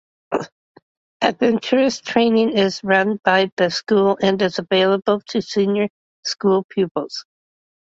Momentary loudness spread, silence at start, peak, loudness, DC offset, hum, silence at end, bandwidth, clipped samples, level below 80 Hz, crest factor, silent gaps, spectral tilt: 10 LU; 0.3 s; -2 dBFS; -19 LUFS; under 0.1%; none; 0.7 s; 7.8 kHz; under 0.1%; -62 dBFS; 18 dB; 0.52-0.75 s, 0.82-1.20 s, 3.52-3.57 s, 5.90-6.23 s, 6.65-6.69 s, 6.91-6.95 s; -5 dB/octave